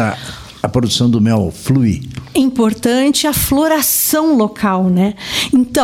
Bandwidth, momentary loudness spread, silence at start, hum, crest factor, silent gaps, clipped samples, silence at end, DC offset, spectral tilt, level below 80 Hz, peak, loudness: 16.5 kHz; 7 LU; 0 s; none; 12 dB; none; under 0.1%; 0 s; under 0.1%; -4.5 dB/octave; -38 dBFS; 0 dBFS; -14 LUFS